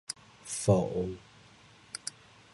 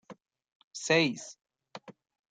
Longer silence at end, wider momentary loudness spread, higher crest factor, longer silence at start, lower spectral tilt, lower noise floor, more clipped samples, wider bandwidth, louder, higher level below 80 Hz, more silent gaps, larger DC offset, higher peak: about the same, 0.45 s vs 0.4 s; second, 16 LU vs 23 LU; about the same, 24 dB vs 22 dB; about the same, 0.1 s vs 0.1 s; first, -5.5 dB/octave vs -3.5 dB/octave; first, -57 dBFS vs -51 dBFS; neither; first, 11.5 kHz vs 9.6 kHz; second, -32 LUFS vs -29 LUFS; first, -56 dBFS vs -80 dBFS; second, none vs 0.52-0.71 s; neither; about the same, -10 dBFS vs -12 dBFS